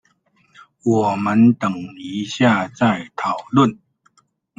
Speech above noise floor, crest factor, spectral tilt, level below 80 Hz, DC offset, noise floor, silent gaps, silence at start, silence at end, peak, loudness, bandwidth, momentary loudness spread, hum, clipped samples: 43 dB; 18 dB; -6.5 dB/octave; -58 dBFS; under 0.1%; -61 dBFS; none; 0.85 s; 0.85 s; 0 dBFS; -18 LUFS; 7.8 kHz; 12 LU; none; under 0.1%